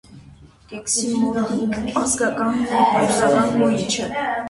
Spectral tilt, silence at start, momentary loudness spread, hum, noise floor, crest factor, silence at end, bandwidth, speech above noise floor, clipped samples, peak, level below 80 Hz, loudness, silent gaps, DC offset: -4 dB/octave; 0.1 s; 6 LU; none; -46 dBFS; 16 dB; 0 s; 11.5 kHz; 26 dB; under 0.1%; -4 dBFS; -50 dBFS; -19 LUFS; none; under 0.1%